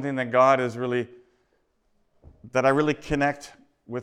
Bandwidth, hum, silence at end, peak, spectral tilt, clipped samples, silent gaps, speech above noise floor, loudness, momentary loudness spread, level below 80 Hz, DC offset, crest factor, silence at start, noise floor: 12 kHz; none; 0 s; -8 dBFS; -6 dB/octave; under 0.1%; none; 46 dB; -23 LUFS; 15 LU; -52 dBFS; under 0.1%; 18 dB; 0 s; -69 dBFS